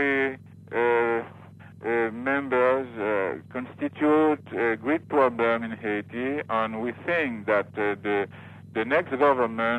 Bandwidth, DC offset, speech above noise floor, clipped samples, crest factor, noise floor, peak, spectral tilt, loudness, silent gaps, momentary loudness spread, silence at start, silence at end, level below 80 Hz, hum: 9 kHz; under 0.1%; 21 dB; under 0.1%; 16 dB; -46 dBFS; -10 dBFS; -7.5 dB/octave; -26 LUFS; none; 10 LU; 0 s; 0 s; -70 dBFS; none